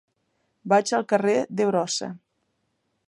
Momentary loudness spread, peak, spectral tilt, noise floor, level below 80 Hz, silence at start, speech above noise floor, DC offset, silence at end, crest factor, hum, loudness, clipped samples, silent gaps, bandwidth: 10 LU; -6 dBFS; -4 dB/octave; -74 dBFS; -76 dBFS; 0.65 s; 51 dB; under 0.1%; 0.9 s; 20 dB; none; -23 LUFS; under 0.1%; none; 11.5 kHz